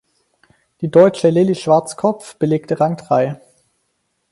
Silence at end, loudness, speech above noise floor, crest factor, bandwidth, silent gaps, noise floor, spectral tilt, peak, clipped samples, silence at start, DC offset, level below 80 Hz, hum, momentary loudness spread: 0.95 s; -16 LUFS; 54 dB; 16 dB; 11.5 kHz; none; -69 dBFS; -7 dB/octave; 0 dBFS; under 0.1%; 0.8 s; under 0.1%; -60 dBFS; none; 10 LU